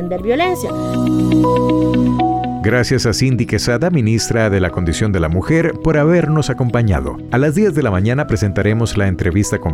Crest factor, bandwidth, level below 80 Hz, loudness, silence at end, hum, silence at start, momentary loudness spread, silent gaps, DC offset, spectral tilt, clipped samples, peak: 10 dB; 15.5 kHz; -32 dBFS; -15 LUFS; 0 s; none; 0 s; 4 LU; none; under 0.1%; -6 dB/octave; under 0.1%; -4 dBFS